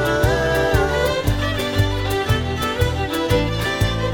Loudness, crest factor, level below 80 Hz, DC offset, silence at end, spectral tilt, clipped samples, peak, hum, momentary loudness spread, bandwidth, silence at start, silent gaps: -20 LUFS; 16 dB; -28 dBFS; under 0.1%; 0 s; -5.5 dB/octave; under 0.1%; -4 dBFS; none; 3 LU; over 20 kHz; 0 s; none